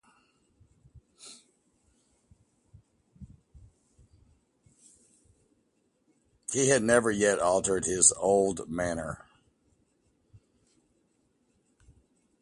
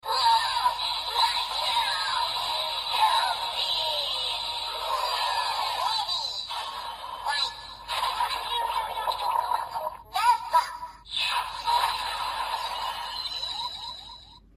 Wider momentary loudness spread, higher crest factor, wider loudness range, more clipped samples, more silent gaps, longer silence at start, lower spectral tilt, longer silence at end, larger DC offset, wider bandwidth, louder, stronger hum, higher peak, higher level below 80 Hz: first, 26 LU vs 10 LU; first, 26 dB vs 18 dB; first, 15 LU vs 4 LU; neither; neither; first, 0.95 s vs 0.05 s; first, -3 dB/octave vs 0.5 dB/octave; first, 3.25 s vs 0.15 s; neither; second, 11.5 kHz vs 15.5 kHz; about the same, -25 LUFS vs -27 LUFS; neither; first, -6 dBFS vs -10 dBFS; about the same, -60 dBFS vs -56 dBFS